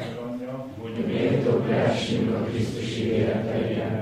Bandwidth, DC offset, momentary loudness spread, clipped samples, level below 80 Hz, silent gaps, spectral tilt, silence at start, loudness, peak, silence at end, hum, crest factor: 12.5 kHz; under 0.1%; 11 LU; under 0.1%; -54 dBFS; none; -7 dB/octave; 0 s; -26 LUFS; -10 dBFS; 0 s; none; 16 dB